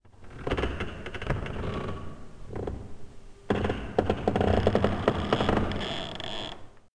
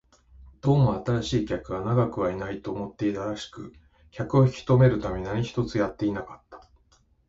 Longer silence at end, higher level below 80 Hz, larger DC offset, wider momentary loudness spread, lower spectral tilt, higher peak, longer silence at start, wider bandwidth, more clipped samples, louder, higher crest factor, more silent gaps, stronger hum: second, 0.2 s vs 0.7 s; first, -40 dBFS vs -48 dBFS; neither; about the same, 16 LU vs 14 LU; about the same, -6.5 dB/octave vs -7.5 dB/octave; about the same, -8 dBFS vs -8 dBFS; second, 0.15 s vs 0.4 s; first, 10.5 kHz vs 7.8 kHz; neither; second, -30 LUFS vs -26 LUFS; about the same, 22 dB vs 18 dB; neither; neither